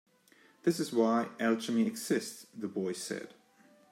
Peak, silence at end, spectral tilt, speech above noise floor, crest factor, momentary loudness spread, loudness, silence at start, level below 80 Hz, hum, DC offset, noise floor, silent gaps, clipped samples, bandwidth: -16 dBFS; 0.6 s; -5 dB/octave; 32 dB; 18 dB; 13 LU; -33 LUFS; 0.65 s; -84 dBFS; none; under 0.1%; -64 dBFS; none; under 0.1%; 16 kHz